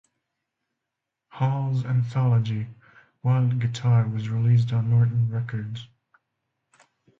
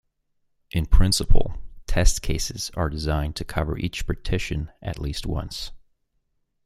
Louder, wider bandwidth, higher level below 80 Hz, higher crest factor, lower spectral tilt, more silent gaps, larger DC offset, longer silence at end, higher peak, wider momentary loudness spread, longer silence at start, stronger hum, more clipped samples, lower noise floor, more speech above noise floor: about the same, -24 LUFS vs -26 LUFS; second, 7.4 kHz vs 14 kHz; second, -58 dBFS vs -26 dBFS; second, 14 dB vs 20 dB; first, -8 dB/octave vs -4.5 dB/octave; neither; neither; first, 1.35 s vs 0.9 s; second, -10 dBFS vs -2 dBFS; about the same, 11 LU vs 11 LU; first, 1.35 s vs 0.75 s; neither; neither; first, -84 dBFS vs -71 dBFS; first, 62 dB vs 51 dB